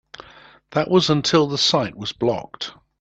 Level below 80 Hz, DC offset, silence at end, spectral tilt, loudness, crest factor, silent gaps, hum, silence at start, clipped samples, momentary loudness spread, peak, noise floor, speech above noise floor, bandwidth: -56 dBFS; under 0.1%; 0.3 s; -4.5 dB/octave; -19 LUFS; 20 dB; none; none; 0.2 s; under 0.1%; 14 LU; -2 dBFS; -48 dBFS; 28 dB; 8.6 kHz